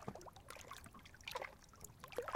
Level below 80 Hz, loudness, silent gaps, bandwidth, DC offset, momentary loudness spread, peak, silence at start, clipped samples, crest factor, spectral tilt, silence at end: -68 dBFS; -52 LUFS; none; 16.5 kHz; under 0.1%; 10 LU; -24 dBFS; 0 s; under 0.1%; 28 dB; -3.5 dB/octave; 0 s